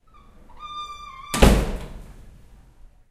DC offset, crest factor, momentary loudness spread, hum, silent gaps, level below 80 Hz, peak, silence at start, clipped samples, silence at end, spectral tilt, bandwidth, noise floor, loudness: under 0.1%; 24 dB; 24 LU; none; none; -28 dBFS; 0 dBFS; 0.6 s; under 0.1%; 1 s; -5 dB/octave; 15.5 kHz; -49 dBFS; -22 LUFS